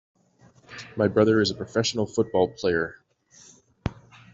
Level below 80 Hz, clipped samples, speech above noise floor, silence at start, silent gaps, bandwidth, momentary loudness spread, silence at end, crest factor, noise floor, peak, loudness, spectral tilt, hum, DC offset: -54 dBFS; under 0.1%; 34 dB; 0.7 s; none; 8 kHz; 16 LU; 0.4 s; 18 dB; -57 dBFS; -8 dBFS; -25 LUFS; -5 dB/octave; none; under 0.1%